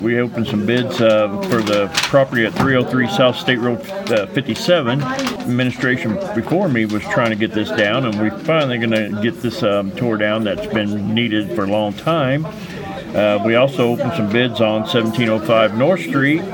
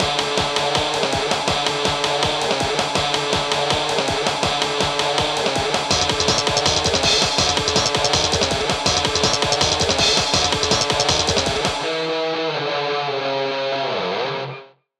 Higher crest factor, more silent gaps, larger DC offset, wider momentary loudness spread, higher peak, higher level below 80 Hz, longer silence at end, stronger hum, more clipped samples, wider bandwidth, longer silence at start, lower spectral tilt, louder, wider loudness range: about the same, 16 dB vs 20 dB; neither; neither; about the same, 6 LU vs 6 LU; about the same, 0 dBFS vs 0 dBFS; second, -52 dBFS vs -42 dBFS; second, 0 s vs 0.35 s; neither; neither; first, 18 kHz vs 14.5 kHz; about the same, 0 s vs 0 s; first, -6 dB/octave vs -2.5 dB/octave; about the same, -17 LUFS vs -18 LUFS; about the same, 3 LU vs 3 LU